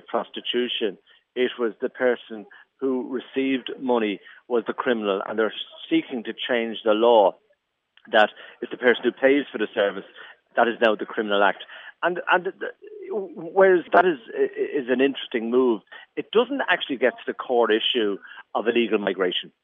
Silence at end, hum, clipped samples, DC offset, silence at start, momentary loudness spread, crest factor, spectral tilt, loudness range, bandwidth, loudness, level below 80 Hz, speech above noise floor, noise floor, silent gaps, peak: 0.15 s; none; under 0.1%; under 0.1%; 0.1 s; 13 LU; 20 dB; -7 dB/octave; 5 LU; 5.2 kHz; -23 LUFS; -80 dBFS; 46 dB; -69 dBFS; none; -4 dBFS